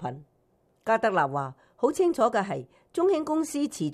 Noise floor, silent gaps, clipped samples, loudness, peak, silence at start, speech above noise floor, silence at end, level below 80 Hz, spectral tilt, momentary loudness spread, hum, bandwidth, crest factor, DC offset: -68 dBFS; none; under 0.1%; -27 LUFS; -10 dBFS; 0 s; 42 dB; 0 s; -68 dBFS; -5.5 dB/octave; 13 LU; none; 15 kHz; 16 dB; under 0.1%